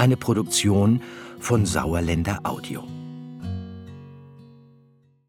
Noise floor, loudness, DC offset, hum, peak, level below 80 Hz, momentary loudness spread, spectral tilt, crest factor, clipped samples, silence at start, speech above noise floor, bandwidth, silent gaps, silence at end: -58 dBFS; -23 LUFS; under 0.1%; none; -4 dBFS; -44 dBFS; 19 LU; -5.5 dB/octave; 20 dB; under 0.1%; 0 s; 36 dB; 17 kHz; none; 0.8 s